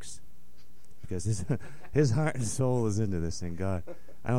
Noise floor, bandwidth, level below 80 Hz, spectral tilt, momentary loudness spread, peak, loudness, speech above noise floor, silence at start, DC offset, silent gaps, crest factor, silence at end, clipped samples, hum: -60 dBFS; 15.5 kHz; -50 dBFS; -6.5 dB/octave; 14 LU; -12 dBFS; -31 LUFS; 30 dB; 0 s; 2%; none; 18 dB; 0 s; under 0.1%; none